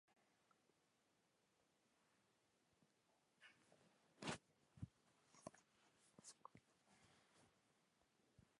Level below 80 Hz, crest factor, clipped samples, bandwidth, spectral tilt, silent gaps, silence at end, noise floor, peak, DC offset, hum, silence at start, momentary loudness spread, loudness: -82 dBFS; 30 dB; under 0.1%; 11 kHz; -4 dB/octave; none; 0.05 s; -84 dBFS; -36 dBFS; under 0.1%; none; 0.1 s; 13 LU; -59 LUFS